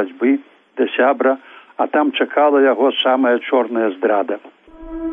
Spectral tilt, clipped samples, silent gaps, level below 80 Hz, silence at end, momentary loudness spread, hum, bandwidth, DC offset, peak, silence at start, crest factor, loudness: -6.5 dB/octave; under 0.1%; none; -50 dBFS; 0 s; 13 LU; none; 3.9 kHz; under 0.1%; -4 dBFS; 0 s; 12 dB; -17 LUFS